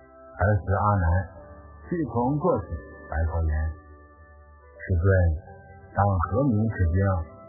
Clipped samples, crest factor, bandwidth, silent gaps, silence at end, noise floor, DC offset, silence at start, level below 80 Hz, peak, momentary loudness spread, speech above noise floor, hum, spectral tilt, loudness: under 0.1%; 18 dB; 2.1 kHz; none; 0 s; -50 dBFS; under 0.1%; 0.2 s; -32 dBFS; -8 dBFS; 16 LU; 27 dB; none; -15 dB/octave; -25 LUFS